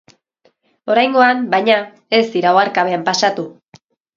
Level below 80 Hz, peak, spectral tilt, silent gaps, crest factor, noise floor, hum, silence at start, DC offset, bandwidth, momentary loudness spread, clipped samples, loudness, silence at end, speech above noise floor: -66 dBFS; 0 dBFS; -3.5 dB/octave; none; 16 dB; -59 dBFS; none; 0.85 s; under 0.1%; 7.6 kHz; 6 LU; under 0.1%; -15 LUFS; 0.65 s; 45 dB